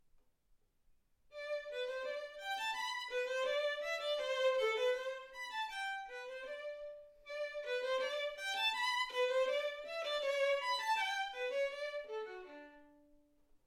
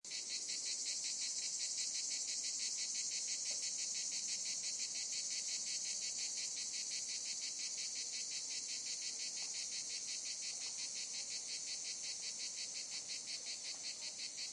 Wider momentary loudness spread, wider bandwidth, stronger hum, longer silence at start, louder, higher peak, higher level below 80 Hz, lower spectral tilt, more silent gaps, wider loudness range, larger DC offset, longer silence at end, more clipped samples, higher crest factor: first, 12 LU vs 4 LU; first, 16 kHz vs 11.5 kHz; neither; first, 1.3 s vs 0.05 s; about the same, -38 LUFS vs -40 LUFS; first, -24 dBFS vs -28 dBFS; first, -76 dBFS vs under -90 dBFS; first, 1 dB/octave vs 3 dB/octave; neither; first, 6 LU vs 3 LU; neither; first, 0.75 s vs 0 s; neither; about the same, 16 dB vs 16 dB